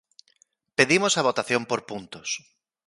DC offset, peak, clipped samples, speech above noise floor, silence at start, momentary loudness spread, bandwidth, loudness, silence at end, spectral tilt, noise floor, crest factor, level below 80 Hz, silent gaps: under 0.1%; -2 dBFS; under 0.1%; 40 dB; 0.8 s; 14 LU; 11.5 kHz; -24 LUFS; 0.5 s; -3 dB/octave; -65 dBFS; 24 dB; -68 dBFS; none